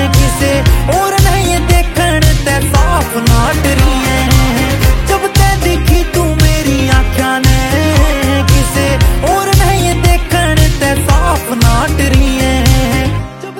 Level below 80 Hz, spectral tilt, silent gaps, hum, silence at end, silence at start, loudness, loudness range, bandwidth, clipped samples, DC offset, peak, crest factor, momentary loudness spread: -14 dBFS; -5 dB/octave; none; none; 0 s; 0 s; -11 LUFS; 0 LU; 17 kHz; 0.2%; under 0.1%; 0 dBFS; 10 dB; 2 LU